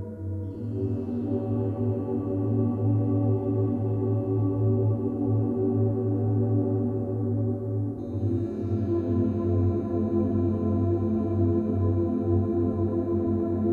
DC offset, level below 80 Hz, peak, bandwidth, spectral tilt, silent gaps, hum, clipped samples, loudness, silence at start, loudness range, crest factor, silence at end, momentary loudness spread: under 0.1%; -50 dBFS; -12 dBFS; 2.7 kHz; -12.5 dB/octave; none; none; under 0.1%; -27 LUFS; 0 s; 2 LU; 12 dB; 0 s; 5 LU